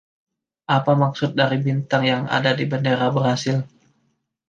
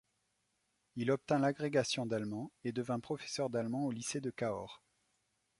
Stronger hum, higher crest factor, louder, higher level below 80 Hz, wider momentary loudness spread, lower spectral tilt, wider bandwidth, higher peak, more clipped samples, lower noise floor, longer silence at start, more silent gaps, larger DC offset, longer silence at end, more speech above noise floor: neither; about the same, 18 dB vs 20 dB; first, -20 LUFS vs -37 LUFS; first, -64 dBFS vs -74 dBFS; second, 5 LU vs 9 LU; about the same, -6 dB/octave vs -5 dB/octave; second, 7.6 kHz vs 11.5 kHz; first, -2 dBFS vs -18 dBFS; neither; second, -69 dBFS vs -81 dBFS; second, 0.7 s vs 0.95 s; neither; neither; about the same, 0.8 s vs 0.85 s; first, 49 dB vs 44 dB